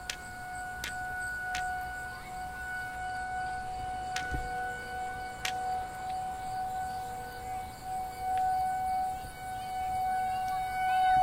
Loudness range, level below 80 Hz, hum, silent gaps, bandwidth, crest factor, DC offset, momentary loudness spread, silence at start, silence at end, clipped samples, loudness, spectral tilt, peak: 4 LU; -50 dBFS; none; none; 16 kHz; 22 dB; under 0.1%; 9 LU; 0 s; 0 s; under 0.1%; -35 LUFS; -3 dB/octave; -12 dBFS